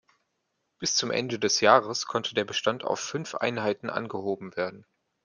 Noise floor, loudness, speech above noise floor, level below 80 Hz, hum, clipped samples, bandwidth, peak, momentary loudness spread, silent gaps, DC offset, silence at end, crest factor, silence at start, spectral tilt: -78 dBFS; -27 LUFS; 51 dB; -72 dBFS; none; under 0.1%; 11 kHz; -4 dBFS; 12 LU; none; under 0.1%; 0.45 s; 24 dB; 0.8 s; -2.5 dB/octave